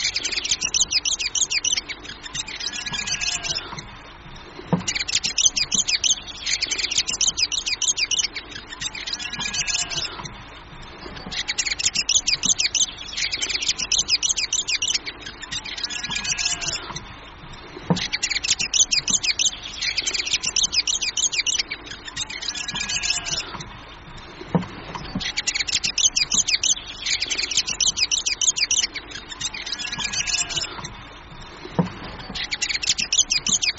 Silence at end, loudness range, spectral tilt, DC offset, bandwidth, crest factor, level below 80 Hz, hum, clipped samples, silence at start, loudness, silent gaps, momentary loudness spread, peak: 0 s; 7 LU; 0 dB/octave; under 0.1%; 8.2 kHz; 22 dB; -46 dBFS; none; under 0.1%; 0 s; -21 LUFS; none; 17 LU; -2 dBFS